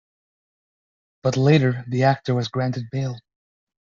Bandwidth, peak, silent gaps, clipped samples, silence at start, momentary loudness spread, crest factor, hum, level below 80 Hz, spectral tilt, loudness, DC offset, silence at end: 7.2 kHz; -4 dBFS; none; under 0.1%; 1.25 s; 11 LU; 20 dB; none; -58 dBFS; -6.5 dB/octave; -22 LUFS; under 0.1%; 0.75 s